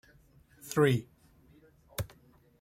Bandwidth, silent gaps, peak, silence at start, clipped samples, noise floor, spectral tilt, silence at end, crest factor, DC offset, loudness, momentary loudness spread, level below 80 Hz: 16 kHz; none; -14 dBFS; 0.65 s; under 0.1%; -62 dBFS; -6 dB/octave; 0.55 s; 22 dB; under 0.1%; -32 LUFS; 17 LU; -60 dBFS